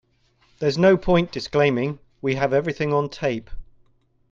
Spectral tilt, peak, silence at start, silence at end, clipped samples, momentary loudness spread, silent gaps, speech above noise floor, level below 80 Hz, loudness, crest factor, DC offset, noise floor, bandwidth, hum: -7 dB/octave; -4 dBFS; 0.6 s; 0.7 s; under 0.1%; 9 LU; none; 42 dB; -44 dBFS; -22 LUFS; 18 dB; under 0.1%; -62 dBFS; 7.6 kHz; none